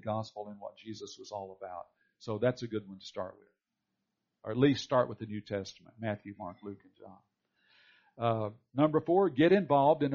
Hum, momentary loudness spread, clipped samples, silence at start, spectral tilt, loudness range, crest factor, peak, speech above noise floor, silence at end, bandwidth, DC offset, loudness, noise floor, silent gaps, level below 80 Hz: none; 20 LU; under 0.1%; 0.05 s; -5.5 dB/octave; 9 LU; 20 dB; -12 dBFS; 54 dB; 0 s; 7.2 kHz; under 0.1%; -31 LUFS; -86 dBFS; none; -72 dBFS